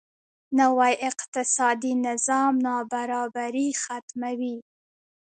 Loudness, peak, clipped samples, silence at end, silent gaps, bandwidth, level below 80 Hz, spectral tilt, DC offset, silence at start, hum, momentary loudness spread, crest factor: -25 LUFS; -8 dBFS; under 0.1%; 0.8 s; 1.28-1.33 s, 4.02-4.08 s; 9.6 kHz; -78 dBFS; -2 dB/octave; under 0.1%; 0.5 s; none; 10 LU; 18 dB